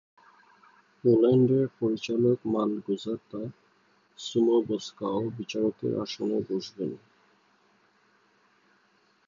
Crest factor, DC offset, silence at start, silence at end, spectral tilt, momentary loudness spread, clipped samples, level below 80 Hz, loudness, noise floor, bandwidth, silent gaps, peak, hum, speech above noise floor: 18 dB; under 0.1%; 1.05 s; 2.3 s; -7 dB/octave; 14 LU; under 0.1%; -70 dBFS; -27 LUFS; -66 dBFS; 7.4 kHz; none; -10 dBFS; none; 40 dB